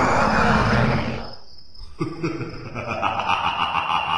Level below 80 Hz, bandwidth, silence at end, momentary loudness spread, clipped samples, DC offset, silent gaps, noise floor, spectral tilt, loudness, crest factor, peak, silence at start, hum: -38 dBFS; 10.5 kHz; 0 s; 14 LU; under 0.1%; under 0.1%; none; -44 dBFS; -5.5 dB/octave; -22 LUFS; 18 dB; -4 dBFS; 0 s; none